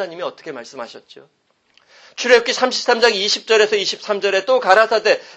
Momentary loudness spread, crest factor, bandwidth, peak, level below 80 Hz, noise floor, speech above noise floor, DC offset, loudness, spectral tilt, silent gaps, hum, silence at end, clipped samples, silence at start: 19 LU; 18 dB; 8.6 kHz; 0 dBFS; -66 dBFS; -57 dBFS; 40 dB; under 0.1%; -15 LUFS; -1.5 dB/octave; none; none; 0.05 s; under 0.1%; 0 s